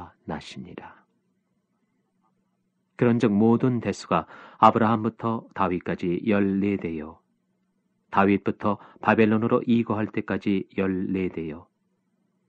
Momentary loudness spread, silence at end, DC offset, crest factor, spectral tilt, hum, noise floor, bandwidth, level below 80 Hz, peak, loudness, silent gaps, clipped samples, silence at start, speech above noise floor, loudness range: 16 LU; 0.9 s; under 0.1%; 24 dB; -8 dB/octave; none; -73 dBFS; 8.6 kHz; -60 dBFS; -2 dBFS; -24 LUFS; none; under 0.1%; 0 s; 49 dB; 4 LU